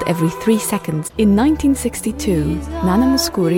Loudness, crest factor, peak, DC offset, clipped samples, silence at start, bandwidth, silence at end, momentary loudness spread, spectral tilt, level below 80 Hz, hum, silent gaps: -17 LUFS; 12 dB; -4 dBFS; under 0.1%; under 0.1%; 0 s; 17 kHz; 0 s; 7 LU; -5.5 dB/octave; -32 dBFS; none; none